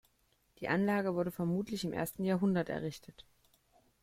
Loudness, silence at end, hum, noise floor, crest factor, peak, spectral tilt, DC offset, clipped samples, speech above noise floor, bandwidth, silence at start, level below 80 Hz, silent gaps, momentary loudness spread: -35 LUFS; 0.8 s; none; -74 dBFS; 18 dB; -18 dBFS; -6.5 dB/octave; under 0.1%; under 0.1%; 40 dB; 16 kHz; 0.6 s; -66 dBFS; none; 10 LU